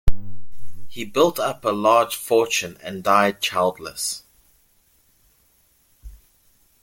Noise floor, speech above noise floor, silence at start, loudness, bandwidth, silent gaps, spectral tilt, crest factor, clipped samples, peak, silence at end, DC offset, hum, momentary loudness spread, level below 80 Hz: -61 dBFS; 40 dB; 0.05 s; -21 LUFS; 17 kHz; none; -3.5 dB/octave; 18 dB; under 0.1%; -2 dBFS; 0.7 s; under 0.1%; none; 15 LU; -36 dBFS